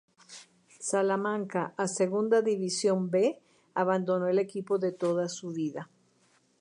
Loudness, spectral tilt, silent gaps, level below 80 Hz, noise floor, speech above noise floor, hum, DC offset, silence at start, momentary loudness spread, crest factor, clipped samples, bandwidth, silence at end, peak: -29 LUFS; -5 dB/octave; none; -84 dBFS; -67 dBFS; 39 dB; none; under 0.1%; 0.3 s; 18 LU; 16 dB; under 0.1%; 11 kHz; 0.75 s; -14 dBFS